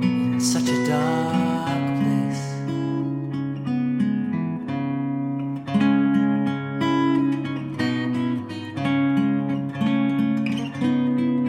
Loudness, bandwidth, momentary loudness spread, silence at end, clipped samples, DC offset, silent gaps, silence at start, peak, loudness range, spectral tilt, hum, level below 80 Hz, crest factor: -23 LUFS; 15.5 kHz; 7 LU; 0 s; under 0.1%; under 0.1%; none; 0 s; -8 dBFS; 3 LU; -6 dB/octave; none; -64 dBFS; 14 dB